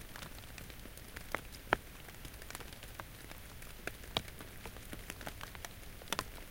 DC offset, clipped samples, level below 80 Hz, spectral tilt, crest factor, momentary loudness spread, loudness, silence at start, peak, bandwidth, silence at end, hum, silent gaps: under 0.1%; under 0.1%; -54 dBFS; -3 dB/octave; 36 dB; 13 LU; -44 LUFS; 0 s; -8 dBFS; 17 kHz; 0 s; none; none